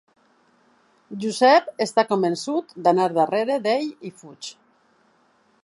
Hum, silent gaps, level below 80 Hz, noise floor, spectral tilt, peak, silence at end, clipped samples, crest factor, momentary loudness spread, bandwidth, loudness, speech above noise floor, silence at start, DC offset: none; none; -78 dBFS; -62 dBFS; -4.5 dB/octave; -4 dBFS; 1.1 s; under 0.1%; 20 dB; 21 LU; 11.5 kHz; -21 LUFS; 41 dB; 1.1 s; under 0.1%